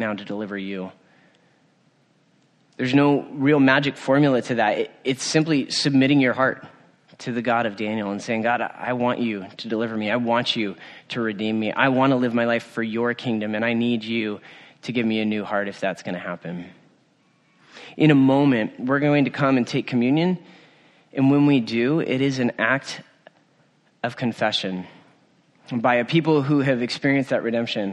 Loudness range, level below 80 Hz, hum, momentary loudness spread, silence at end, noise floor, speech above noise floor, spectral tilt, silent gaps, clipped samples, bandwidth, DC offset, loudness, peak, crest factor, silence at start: 6 LU; -68 dBFS; none; 13 LU; 0 s; -61 dBFS; 40 dB; -6 dB/octave; none; under 0.1%; 10 kHz; under 0.1%; -22 LUFS; -2 dBFS; 20 dB; 0 s